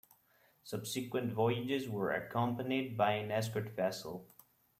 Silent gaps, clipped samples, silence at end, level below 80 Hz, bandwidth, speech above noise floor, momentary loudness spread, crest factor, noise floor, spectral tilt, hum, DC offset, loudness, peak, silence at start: none; under 0.1%; 0.55 s; -74 dBFS; 16 kHz; 35 dB; 11 LU; 18 dB; -70 dBFS; -5.5 dB/octave; none; under 0.1%; -36 LUFS; -18 dBFS; 0.65 s